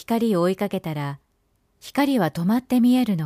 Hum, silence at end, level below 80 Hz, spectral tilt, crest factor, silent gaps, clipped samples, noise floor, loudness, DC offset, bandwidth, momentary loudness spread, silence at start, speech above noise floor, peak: none; 0 s; -60 dBFS; -7 dB/octave; 14 dB; none; under 0.1%; -67 dBFS; -22 LUFS; under 0.1%; 15.5 kHz; 13 LU; 0.1 s; 46 dB; -8 dBFS